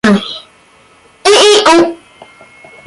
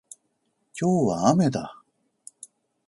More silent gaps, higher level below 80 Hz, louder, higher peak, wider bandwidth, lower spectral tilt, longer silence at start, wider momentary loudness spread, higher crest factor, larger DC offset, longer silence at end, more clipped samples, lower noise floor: neither; first, -50 dBFS vs -62 dBFS; first, -8 LUFS vs -23 LUFS; first, 0 dBFS vs -6 dBFS; about the same, 11.5 kHz vs 11.5 kHz; second, -3 dB/octave vs -6.5 dB/octave; second, 0.05 s vs 0.75 s; second, 16 LU vs 23 LU; second, 12 dB vs 20 dB; neither; second, 0.9 s vs 1.15 s; neither; second, -45 dBFS vs -73 dBFS